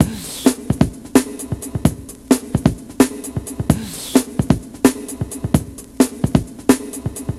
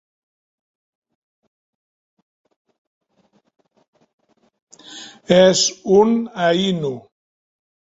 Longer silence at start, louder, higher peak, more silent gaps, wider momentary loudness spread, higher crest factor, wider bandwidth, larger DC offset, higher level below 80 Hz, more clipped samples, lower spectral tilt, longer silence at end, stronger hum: second, 0 s vs 4.9 s; second, -19 LUFS vs -16 LUFS; about the same, 0 dBFS vs 0 dBFS; neither; second, 10 LU vs 23 LU; about the same, 18 dB vs 22 dB; first, 15 kHz vs 8 kHz; neither; first, -34 dBFS vs -62 dBFS; neither; first, -5.5 dB/octave vs -4 dB/octave; second, 0 s vs 0.95 s; neither